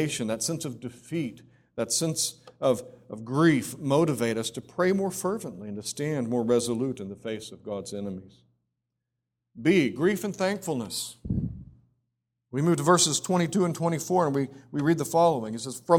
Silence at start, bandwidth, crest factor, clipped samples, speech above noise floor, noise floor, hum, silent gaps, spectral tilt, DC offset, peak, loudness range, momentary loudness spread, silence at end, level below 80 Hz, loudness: 0 s; 17.5 kHz; 22 dB; under 0.1%; 57 dB; -84 dBFS; none; none; -4.5 dB/octave; under 0.1%; -6 dBFS; 6 LU; 13 LU; 0 s; -56 dBFS; -27 LUFS